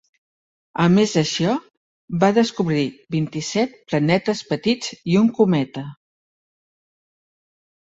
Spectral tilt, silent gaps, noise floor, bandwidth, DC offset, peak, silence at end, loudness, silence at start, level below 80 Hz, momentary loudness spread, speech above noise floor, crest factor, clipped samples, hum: -6 dB/octave; 1.77-2.08 s; under -90 dBFS; 8 kHz; under 0.1%; -2 dBFS; 2 s; -20 LUFS; 0.75 s; -58 dBFS; 10 LU; over 71 dB; 18 dB; under 0.1%; none